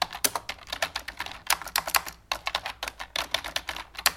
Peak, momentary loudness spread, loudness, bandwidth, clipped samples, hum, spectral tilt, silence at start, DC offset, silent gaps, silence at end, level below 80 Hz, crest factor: -4 dBFS; 10 LU; -29 LUFS; 17 kHz; under 0.1%; none; 0.5 dB/octave; 0 s; under 0.1%; none; 0 s; -52 dBFS; 28 dB